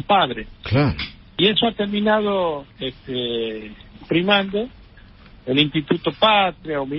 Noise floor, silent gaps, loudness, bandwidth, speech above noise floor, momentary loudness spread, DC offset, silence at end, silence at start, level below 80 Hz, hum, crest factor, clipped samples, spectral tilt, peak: -45 dBFS; none; -20 LUFS; 5.8 kHz; 25 dB; 14 LU; under 0.1%; 0 s; 0 s; -44 dBFS; none; 20 dB; under 0.1%; -10.5 dB/octave; -2 dBFS